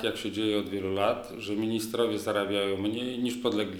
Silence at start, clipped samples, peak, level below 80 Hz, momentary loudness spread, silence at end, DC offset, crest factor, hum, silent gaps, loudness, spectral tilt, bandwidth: 0 s; under 0.1%; -10 dBFS; -64 dBFS; 4 LU; 0 s; under 0.1%; 18 dB; none; none; -30 LUFS; -5 dB/octave; 19.5 kHz